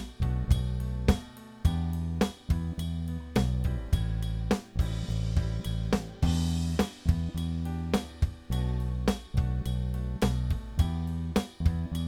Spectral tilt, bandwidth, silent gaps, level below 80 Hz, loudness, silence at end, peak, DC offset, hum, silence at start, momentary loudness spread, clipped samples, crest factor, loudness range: -6.5 dB/octave; 16.5 kHz; none; -34 dBFS; -31 LUFS; 0 s; -8 dBFS; under 0.1%; none; 0 s; 4 LU; under 0.1%; 20 dB; 1 LU